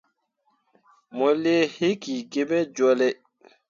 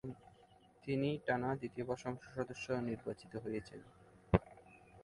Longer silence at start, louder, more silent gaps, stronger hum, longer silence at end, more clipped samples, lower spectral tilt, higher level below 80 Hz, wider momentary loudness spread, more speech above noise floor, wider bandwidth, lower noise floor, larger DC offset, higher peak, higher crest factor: first, 1.15 s vs 0.05 s; first, -23 LUFS vs -40 LUFS; neither; neither; first, 0.55 s vs 0 s; neither; second, -5 dB/octave vs -7 dB/octave; second, -72 dBFS vs -58 dBFS; second, 9 LU vs 21 LU; first, 48 dB vs 25 dB; second, 7.4 kHz vs 11.5 kHz; first, -71 dBFS vs -66 dBFS; neither; about the same, -10 dBFS vs -12 dBFS; second, 16 dB vs 30 dB